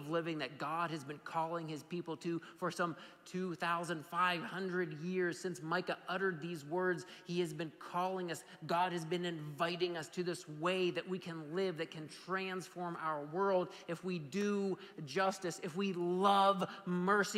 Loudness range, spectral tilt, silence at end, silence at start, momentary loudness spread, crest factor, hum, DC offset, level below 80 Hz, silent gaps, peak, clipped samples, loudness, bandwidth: 4 LU; -5 dB/octave; 0 s; 0 s; 9 LU; 18 dB; none; under 0.1%; -86 dBFS; none; -20 dBFS; under 0.1%; -38 LUFS; 15.5 kHz